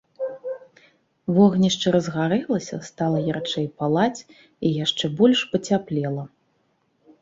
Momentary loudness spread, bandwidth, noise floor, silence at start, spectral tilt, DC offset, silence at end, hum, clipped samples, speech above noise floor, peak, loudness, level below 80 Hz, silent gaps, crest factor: 16 LU; 7.8 kHz; -67 dBFS; 0.2 s; -5.5 dB/octave; under 0.1%; 0.95 s; none; under 0.1%; 46 dB; -6 dBFS; -22 LUFS; -62 dBFS; none; 18 dB